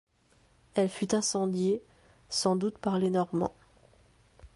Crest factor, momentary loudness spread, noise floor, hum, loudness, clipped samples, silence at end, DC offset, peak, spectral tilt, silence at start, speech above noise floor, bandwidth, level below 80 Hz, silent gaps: 18 dB; 6 LU; -65 dBFS; none; -30 LUFS; under 0.1%; 0.1 s; under 0.1%; -12 dBFS; -5 dB/octave; 0.75 s; 37 dB; 11.5 kHz; -62 dBFS; none